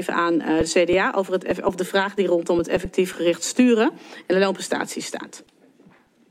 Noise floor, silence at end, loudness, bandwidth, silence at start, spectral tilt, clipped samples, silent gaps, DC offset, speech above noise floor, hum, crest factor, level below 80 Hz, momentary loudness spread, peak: -54 dBFS; 0.9 s; -21 LUFS; 15.5 kHz; 0 s; -4.5 dB/octave; under 0.1%; none; under 0.1%; 33 dB; none; 18 dB; -50 dBFS; 10 LU; -4 dBFS